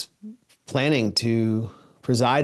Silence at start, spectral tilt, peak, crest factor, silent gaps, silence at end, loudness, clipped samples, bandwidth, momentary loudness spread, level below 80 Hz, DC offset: 0 s; -5.5 dB/octave; -6 dBFS; 18 dB; none; 0 s; -23 LUFS; under 0.1%; 12.5 kHz; 17 LU; -64 dBFS; under 0.1%